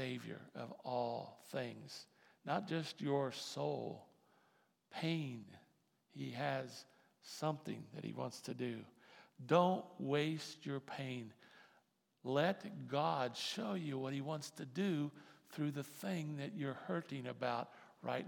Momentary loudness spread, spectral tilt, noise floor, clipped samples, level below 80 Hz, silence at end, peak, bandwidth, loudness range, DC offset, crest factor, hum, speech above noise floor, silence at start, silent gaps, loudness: 16 LU; -5.5 dB/octave; -77 dBFS; under 0.1%; under -90 dBFS; 0 s; -18 dBFS; 18 kHz; 5 LU; under 0.1%; 24 dB; none; 35 dB; 0 s; none; -42 LUFS